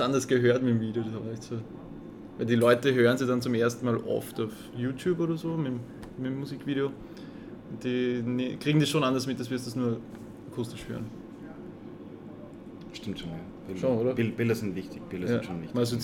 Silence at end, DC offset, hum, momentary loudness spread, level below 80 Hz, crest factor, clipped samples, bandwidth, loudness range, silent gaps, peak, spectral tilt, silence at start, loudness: 0 s; under 0.1%; none; 20 LU; -60 dBFS; 20 dB; under 0.1%; 17.5 kHz; 11 LU; none; -8 dBFS; -6 dB/octave; 0 s; -29 LUFS